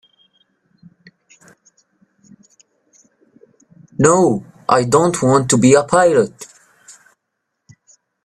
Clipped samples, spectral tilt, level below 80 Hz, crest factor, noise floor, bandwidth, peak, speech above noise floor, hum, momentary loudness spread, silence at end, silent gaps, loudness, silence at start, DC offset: under 0.1%; -5 dB/octave; -56 dBFS; 18 dB; -75 dBFS; 14.5 kHz; 0 dBFS; 62 dB; none; 14 LU; 1.8 s; none; -14 LUFS; 4 s; under 0.1%